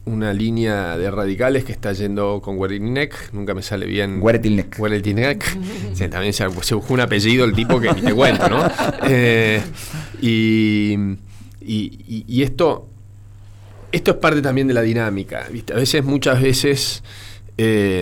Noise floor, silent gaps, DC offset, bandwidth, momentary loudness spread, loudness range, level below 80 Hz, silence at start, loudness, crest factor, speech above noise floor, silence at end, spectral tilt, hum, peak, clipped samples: -40 dBFS; none; under 0.1%; 18.5 kHz; 11 LU; 5 LU; -38 dBFS; 0 s; -18 LUFS; 14 dB; 22 dB; 0 s; -5.5 dB/octave; none; -6 dBFS; under 0.1%